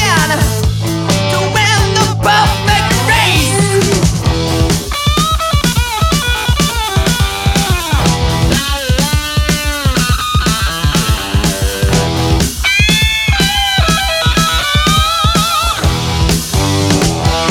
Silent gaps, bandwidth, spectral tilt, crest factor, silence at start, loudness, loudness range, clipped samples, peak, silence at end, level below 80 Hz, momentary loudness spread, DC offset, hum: none; 17.5 kHz; -4 dB/octave; 12 dB; 0 s; -12 LUFS; 2 LU; under 0.1%; 0 dBFS; 0 s; -20 dBFS; 4 LU; under 0.1%; none